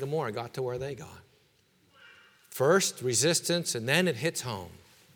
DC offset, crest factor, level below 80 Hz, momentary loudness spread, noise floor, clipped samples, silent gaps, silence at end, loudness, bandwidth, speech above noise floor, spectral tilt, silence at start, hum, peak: under 0.1%; 24 dB; -68 dBFS; 17 LU; -66 dBFS; under 0.1%; none; 0.4 s; -28 LUFS; over 20 kHz; 37 dB; -3.5 dB/octave; 0 s; none; -8 dBFS